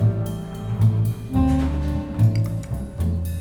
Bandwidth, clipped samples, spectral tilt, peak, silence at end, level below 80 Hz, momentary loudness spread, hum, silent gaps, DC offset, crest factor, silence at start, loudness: 17 kHz; under 0.1%; -8.5 dB/octave; -8 dBFS; 0 s; -30 dBFS; 9 LU; none; none; under 0.1%; 14 dB; 0 s; -23 LUFS